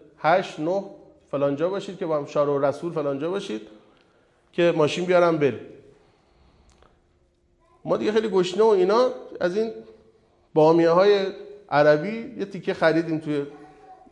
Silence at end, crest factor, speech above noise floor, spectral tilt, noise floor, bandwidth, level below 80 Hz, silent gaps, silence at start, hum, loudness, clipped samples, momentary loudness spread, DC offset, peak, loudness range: 0.15 s; 18 dB; 42 dB; -6.5 dB/octave; -63 dBFS; 10 kHz; -66 dBFS; none; 0.2 s; none; -23 LUFS; under 0.1%; 14 LU; under 0.1%; -6 dBFS; 5 LU